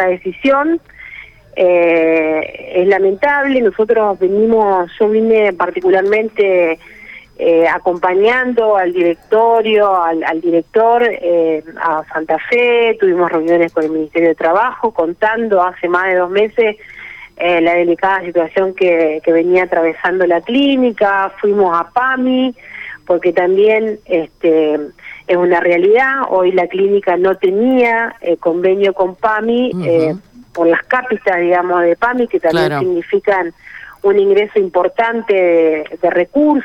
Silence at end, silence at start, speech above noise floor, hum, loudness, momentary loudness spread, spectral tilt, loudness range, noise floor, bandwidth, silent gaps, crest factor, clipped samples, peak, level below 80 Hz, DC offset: 0 s; 0 s; 23 dB; none; -13 LUFS; 7 LU; -7 dB/octave; 2 LU; -35 dBFS; 6.6 kHz; none; 10 dB; under 0.1%; -2 dBFS; -52 dBFS; under 0.1%